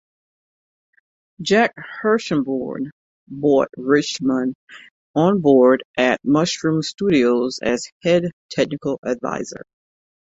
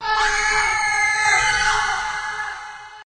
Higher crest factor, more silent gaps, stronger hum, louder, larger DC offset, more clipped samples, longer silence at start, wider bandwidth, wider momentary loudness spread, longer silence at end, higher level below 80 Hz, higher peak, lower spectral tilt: about the same, 18 dB vs 14 dB; first, 2.92-3.27 s, 4.55-4.67 s, 4.91-5.14 s, 5.85-5.94 s, 7.92-8.01 s, 8.33-8.49 s, 8.98-9.02 s vs none; neither; about the same, -19 LUFS vs -18 LUFS; neither; neither; first, 1.4 s vs 0 s; second, 8 kHz vs 13.5 kHz; about the same, 12 LU vs 12 LU; first, 0.7 s vs 0 s; second, -58 dBFS vs -40 dBFS; first, -2 dBFS vs -6 dBFS; first, -5.5 dB/octave vs 0.5 dB/octave